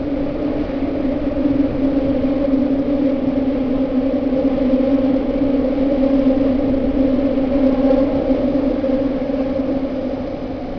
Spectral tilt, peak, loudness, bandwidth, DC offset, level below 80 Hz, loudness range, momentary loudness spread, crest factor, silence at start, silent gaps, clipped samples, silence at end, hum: -9.5 dB/octave; -4 dBFS; -18 LUFS; 5.4 kHz; under 0.1%; -32 dBFS; 2 LU; 6 LU; 14 dB; 0 s; none; under 0.1%; 0 s; none